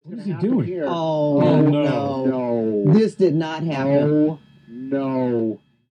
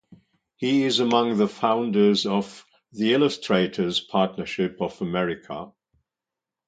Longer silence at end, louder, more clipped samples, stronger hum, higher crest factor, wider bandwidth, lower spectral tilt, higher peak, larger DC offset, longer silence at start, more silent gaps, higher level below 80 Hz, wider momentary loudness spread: second, 0.35 s vs 1 s; first, -20 LUFS vs -23 LUFS; neither; neither; second, 14 dB vs 20 dB; about the same, 9.4 kHz vs 9.2 kHz; first, -9 dB/octave vs -5.5 dB/octave; about the same, -6 dBFS vs -4 dBFS; neither; second, 0.05 s vs 0.6 s; neither; about the same, -64 dBFS vs -62 dBFS; second, 10 LU vs 13 LU